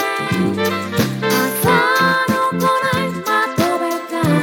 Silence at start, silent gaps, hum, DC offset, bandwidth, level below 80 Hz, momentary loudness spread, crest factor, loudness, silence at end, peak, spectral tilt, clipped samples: 0 s; none; none; under 0.1%; 19 kHz; -52 dBFS; 6 LU; 14 dB; -17 LUFS; 0 s; -2 dBFS; -4.5 dB/octave; under 0.1%